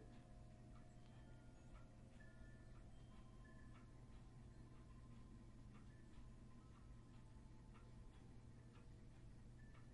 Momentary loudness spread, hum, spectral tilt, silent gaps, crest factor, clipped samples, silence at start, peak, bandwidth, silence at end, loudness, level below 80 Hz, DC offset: 1 LU; none; -6.5 dB/octave; none; 12 dB; under 0.1%; 0 s; -50 dBFS; 10.5 kHz; 0 s; -65 LUFS; -66 dBFS; under 0.1%